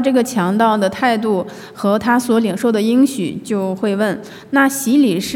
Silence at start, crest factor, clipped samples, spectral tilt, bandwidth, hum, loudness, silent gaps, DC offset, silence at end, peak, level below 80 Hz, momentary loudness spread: 0 s; 14 dB; under 0.1%; -5 dB/octave; 17 kHz; none; -16 LUFS; none; under 0.1%; 0 s; -2 dBFS; -60 dBFS; 7 LU